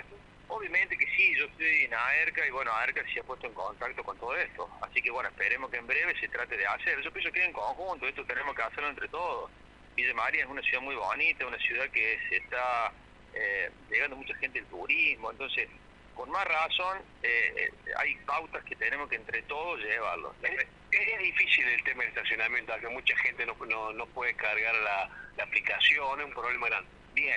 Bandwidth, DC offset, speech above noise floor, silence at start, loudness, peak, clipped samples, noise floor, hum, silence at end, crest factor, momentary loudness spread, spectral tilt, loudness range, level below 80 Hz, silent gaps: 10.5 kHz; under 0.1%; 19 dB; 0 s; -29 LUFS; -12 dBFS; under 0.1%; -51 dBFS; 50 Hz at -60 dBFS; 0 s; 20 dB; 10 LU; -3 dB/octave; 4 LU; -60 dBFS; none